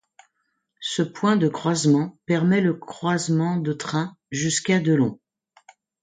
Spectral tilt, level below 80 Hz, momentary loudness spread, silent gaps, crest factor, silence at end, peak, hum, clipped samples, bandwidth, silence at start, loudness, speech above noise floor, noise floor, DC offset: -5.5 dB/octave; -66 dBFS; 8 LU; none; 16 dB; 0.9 s; -8 dBFS; none; under 0.1%; 9.6 kHz; 0.8 s; -23 LUFS; 53 dB; -75 dBFS; under 0.1%